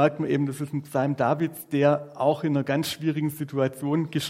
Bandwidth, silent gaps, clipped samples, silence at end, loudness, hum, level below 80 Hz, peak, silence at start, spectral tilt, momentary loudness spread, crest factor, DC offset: 16 kHz; none; under 0.1%; 0 s; -26 LUFS; none; -70 dBFS; -6 dBFS; 0 s; -6.5 dB/octave; 6 LU; 20 dB; under 0.1%